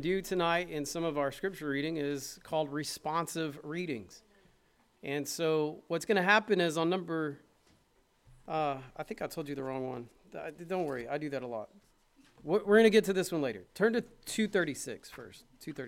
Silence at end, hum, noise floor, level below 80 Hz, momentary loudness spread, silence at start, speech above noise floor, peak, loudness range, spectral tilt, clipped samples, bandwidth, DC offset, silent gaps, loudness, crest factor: 0 s; none; -70 dBFS; -64 dBFS; 18 LU; 0 s; 37 dB; -10 dBFS; 9 LU; -4.5 dB/octave; under 0.1%; 16.5 kHz; under 0.1%; none; -32 LUFS; 22 dB